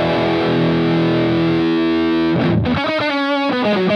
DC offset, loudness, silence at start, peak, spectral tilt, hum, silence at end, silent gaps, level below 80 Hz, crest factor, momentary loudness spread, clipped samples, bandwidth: under 0.1%; -16 LUFS; 0 s; -6 dBFS; -7.5 dB/octave; none; 0 s; none; -46 dBFS; 10 dB; 2 LU; under 0.1%; 6.6 kHz